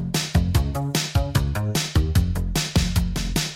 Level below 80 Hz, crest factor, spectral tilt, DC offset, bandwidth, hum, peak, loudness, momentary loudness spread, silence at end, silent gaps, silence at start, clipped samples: -26 dBFS; 14 dB; -4.5 dB/octave; under 0.1%; 17 kHz; none; -8 dBFS; -23 LUFS; 3 LU; 0 s; none; 0 s; under 0.1%